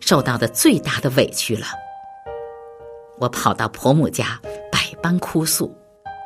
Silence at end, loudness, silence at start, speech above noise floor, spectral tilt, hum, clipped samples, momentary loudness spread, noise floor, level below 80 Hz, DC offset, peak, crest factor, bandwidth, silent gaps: 0 s; -19 LUFS; 0 s; 20 dB; -4 dB/octave; none; under 0.1%; 21 LU; -39 dBFS; -52 dBFS; under 0.1%; 0 dBFS; 20 dB; 15 kHz; none